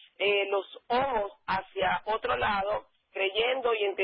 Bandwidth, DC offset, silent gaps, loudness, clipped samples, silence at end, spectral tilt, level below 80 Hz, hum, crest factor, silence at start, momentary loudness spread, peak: 5.6 kHz; under 0.1%; none; -29 LUFS; under 0.1%; 0 s; -7.5 dB/octave; -58 dBFS; none; 16 dB; 0.2 s; 6 LU; -14 dBFS